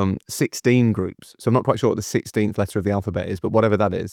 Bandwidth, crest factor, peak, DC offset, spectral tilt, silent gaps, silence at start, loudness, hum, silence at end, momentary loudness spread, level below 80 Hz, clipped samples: 17 kHz; 18 dB; -2 dBFS; under 0.1%; -6.5 dB/octave; none; 0 s; -21 LUFS; none; 0 s; 8 LU; -54 dBFS; under 0.1%